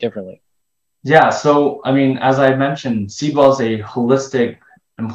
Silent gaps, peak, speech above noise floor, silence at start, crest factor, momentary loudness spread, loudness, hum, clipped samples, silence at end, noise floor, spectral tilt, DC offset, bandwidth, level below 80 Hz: none; 0 dBFS; 60 dB; 0 s; 16 dB; 12 LU; -15 LUFS; none; 0.1%; 0 s; -75 dBFS; -6 dB/octave; under 0.1%; 8.2 kHz; -54 dBFS